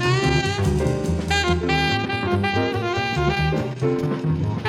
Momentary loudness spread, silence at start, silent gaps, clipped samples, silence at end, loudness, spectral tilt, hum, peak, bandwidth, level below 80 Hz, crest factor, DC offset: 3 LU; 0 s; none; under 0.1%; 0 s; -21 LUFS; -5.5 dB/octave; none; -6 dBFS; 13.5 kHz; -34 dBFS; 16 dB; under 0.1%